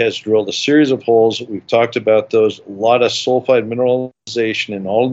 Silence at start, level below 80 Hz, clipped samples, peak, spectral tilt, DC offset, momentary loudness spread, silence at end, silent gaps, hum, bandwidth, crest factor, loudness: 0 s; -68 dBFS; under 0.1%; -2 dBFS; -5 dB/octave; under 0.1%; 6 LU; 0 s; none; none; 8 kHz; 14 dB; -15 LUFS